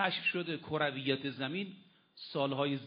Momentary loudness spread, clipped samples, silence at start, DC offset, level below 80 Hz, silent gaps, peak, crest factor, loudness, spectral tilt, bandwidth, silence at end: 9 LU; under 0.1%; 0 s; under 0.1%; -76 dBFS; none; -14 dBFS; 22 dB; -35 LUFS; -3 dB/octave; 5.2 kHz; 0 s